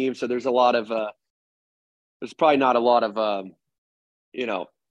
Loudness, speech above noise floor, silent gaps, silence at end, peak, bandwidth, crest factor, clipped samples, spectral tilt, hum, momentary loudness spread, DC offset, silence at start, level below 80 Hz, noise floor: -22 LUFS; over 68 dB; 1.30-2.20 s, 3.78-4.32 s; 0.3 s; -6 dBFS; 8.8 kHz; 18 dB; under 0.1%; -5.5 dB/octave; none; 15 LU; under 0.1%; 0 s; -78 dBFS; under -90 dBFS